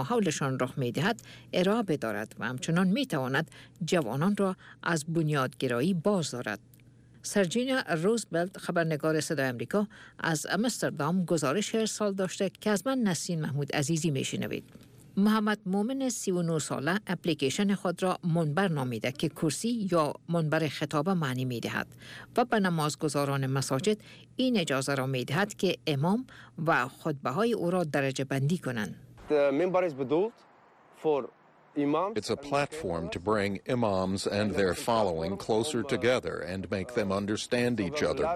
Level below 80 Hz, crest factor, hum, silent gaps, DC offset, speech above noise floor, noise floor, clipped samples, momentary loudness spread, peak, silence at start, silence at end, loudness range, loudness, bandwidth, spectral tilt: -62 dBFS; 14 dB; none; none; under 0.1%; 29 dB; -59 dBFS; under 0.1%; 7 LU; -16 dBFS; 0 s; 0 s; 1 LU; -30 LUFS; 15.5 kHz; -5 dB/octave